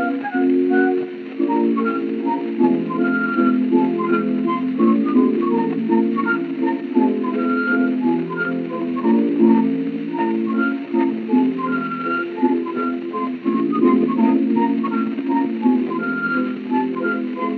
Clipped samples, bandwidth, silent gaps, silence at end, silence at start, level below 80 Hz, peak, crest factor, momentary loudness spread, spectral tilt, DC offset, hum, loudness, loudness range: under 0.1%; 4.7 kHz; none; 0 s; 0 s; -80 dBFS; -4 dBFS; 14 dB; 6 LU; -9.5 dB/octave; under 0.1%; none; -19 LUFS; 2 LU